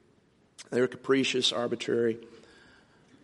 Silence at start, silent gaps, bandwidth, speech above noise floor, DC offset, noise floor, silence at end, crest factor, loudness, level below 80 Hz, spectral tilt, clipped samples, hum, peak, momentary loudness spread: 0.6 s; none; 11.5 kHz; 36 dB; under 0.1%; -65 dBFS; 0.9 s; 18 dB; -28 LUFS; -74 dBFS; -3.5 dB/octave; under 0.1%; none; -12 dBFS; 7 LU